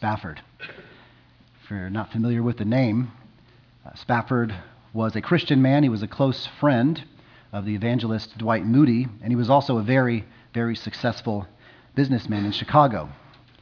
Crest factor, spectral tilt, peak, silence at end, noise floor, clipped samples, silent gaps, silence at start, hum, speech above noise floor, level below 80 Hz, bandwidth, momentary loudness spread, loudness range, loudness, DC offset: 20 dB; -8.5 dB/octave; -2 dBFS; 0.45 s; -54 dBFS; under 0.1%; none; 0 s; none; 32 dB; -56 dBFS; 5.4 kHz; 16 LU; 5 LU; -23 LUFS; under 0.1%